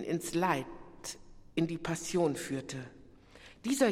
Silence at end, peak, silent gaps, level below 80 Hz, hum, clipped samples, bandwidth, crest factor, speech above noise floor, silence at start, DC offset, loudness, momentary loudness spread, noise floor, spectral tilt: 0 s; -14 dBFS; none; -60 dBFS; none; under 0.1%; 16 kHz; 20 dB; 24 dB; 0 s; under 0.1%; -35 LUFS; 18 LU; -56 dBFS; -5 dB/octave